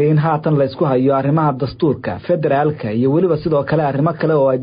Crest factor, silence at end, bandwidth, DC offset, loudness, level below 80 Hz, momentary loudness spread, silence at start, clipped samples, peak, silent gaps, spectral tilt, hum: 10 dB; 0 s; 5.2 kHz; under 0.1%; -16 LUFS; -46 dBFS; 4 LU; 0 s; under 0.1%; -6 dBFS; none; -13.5 dB/octave; none